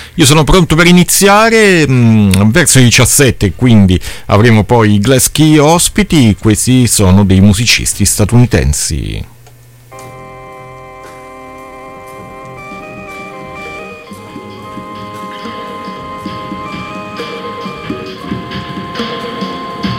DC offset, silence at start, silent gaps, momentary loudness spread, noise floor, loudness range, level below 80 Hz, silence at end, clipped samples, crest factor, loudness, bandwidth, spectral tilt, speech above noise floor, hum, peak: under 0.1%; 0 s; none; 24 LU; -38 dBFS; 21 LU; -28 dBFS; 0 s; 0.1%; 10 dB; -8 LUFS; 17 kHz; -4.5 dB/octave; 31 dB; none; 0 dBFS